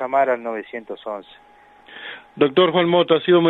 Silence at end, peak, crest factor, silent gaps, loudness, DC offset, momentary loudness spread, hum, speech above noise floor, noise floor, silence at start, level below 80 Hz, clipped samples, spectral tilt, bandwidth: 0 s; -2 dBFS; 18 dB; none; -19 LUFS; under 0.1%; 19 LU; none; 25 dB; -44 dBFS; 0 s; -66 dBFS; under 0.1%; -8.5 dB/octave; 4.1 kHz